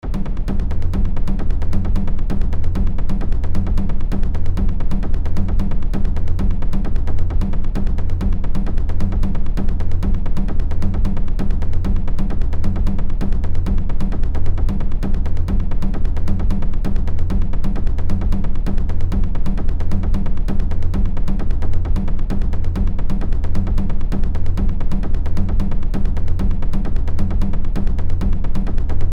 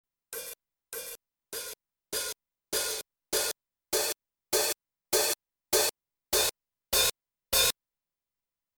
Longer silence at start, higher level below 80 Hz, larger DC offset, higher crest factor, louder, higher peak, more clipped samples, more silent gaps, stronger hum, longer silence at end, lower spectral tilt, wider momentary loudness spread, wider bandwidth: second, 0.05 s vs 0.3 s; first, -16 dBFS vs -58 dBFS; first, 0.8% vs under 0.1%; second, 10 dB vs 22 dB; first, -23 LUFS vs -29 LUFS; first, -2 dBFS vs -12 dBFS; neither; neither; neither; second, 0 s vs 1.1 s; first, -8.5 dB/octave vs 0 dB/octave; second, 2 LU vs 17 LU; second, 3.5 kHz vs over 20 kHz